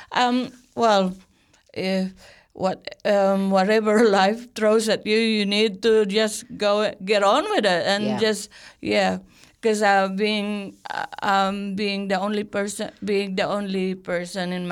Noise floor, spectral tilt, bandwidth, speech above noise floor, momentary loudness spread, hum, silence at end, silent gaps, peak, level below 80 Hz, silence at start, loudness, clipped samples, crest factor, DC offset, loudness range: -56 dBFS; -4.5 dB/octave; 15 kHz; 34 dB; 10 LU; none; 0 s; none; -6 dBFS; -62 dBFS; 0 s; -22 LUFS; under 0.1%; 16 dB; under 0.1%; 5 LU